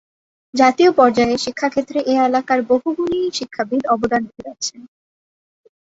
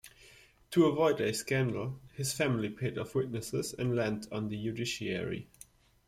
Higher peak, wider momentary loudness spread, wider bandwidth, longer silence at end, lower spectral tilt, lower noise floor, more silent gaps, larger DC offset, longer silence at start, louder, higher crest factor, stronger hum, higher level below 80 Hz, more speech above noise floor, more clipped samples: first, -2 dBFS vs -14 dBFS; first, 13 LU vs 10 LU; second, 8 kHz vs 15.5 kHz; first, 1.1 s vs 0.65 s; second, -4 dB/octave vs -5.5 dB/octave; first, under -90 dBFS vs -59 dBFS; neither; neither; first, 0.55 s vs 0.05 s; first, -17 LUFS vs -33 LUFS; about the same, 16 dB vs 18 dB; neither; first, -54 dBFS vs -62 dBFS; first, over 73 dB vs 27 dB; neither